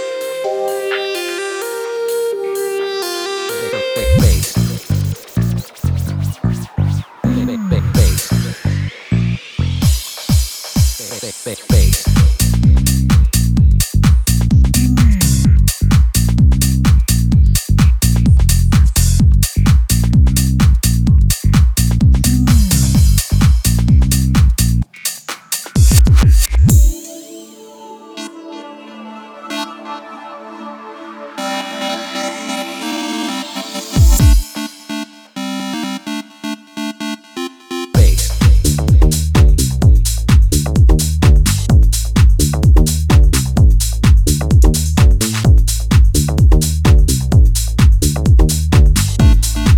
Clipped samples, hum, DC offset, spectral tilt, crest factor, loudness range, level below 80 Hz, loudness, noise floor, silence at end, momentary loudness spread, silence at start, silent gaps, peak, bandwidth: under 0.1%; none; under 0.1%; -5.5 dB/octave; 12 dB; 10 LU; -16 dBFS; -14 LUFS; -35 dBFS; 0 s; 14 LU; 0 s; none; 0 dBFS; 20 kHz